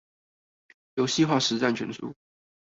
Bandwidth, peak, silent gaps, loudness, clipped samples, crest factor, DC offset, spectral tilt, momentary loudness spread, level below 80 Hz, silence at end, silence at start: 8 kHz; -10 dBFS; none; -26 LUFS; under 0.1%; 20 dB; under 0.1%; -4 dB/octave; 15 LU; -68 dBFS; 0.6 s; 0.95 s